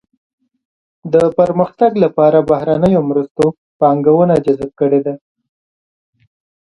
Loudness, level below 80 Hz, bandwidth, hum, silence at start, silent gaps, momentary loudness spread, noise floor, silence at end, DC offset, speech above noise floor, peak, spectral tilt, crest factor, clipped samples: -13 LUFS; -50 dBFS; 11 kHz; none; 1.05 s; 3.31-3.35 s, 3.58-3.80 s; 7 LU; under -90 dBFS; 1.6 s; under 0.1%; over 78 dB; 0 dBFS; -9 dB/octave; 14 dB; under 0.1%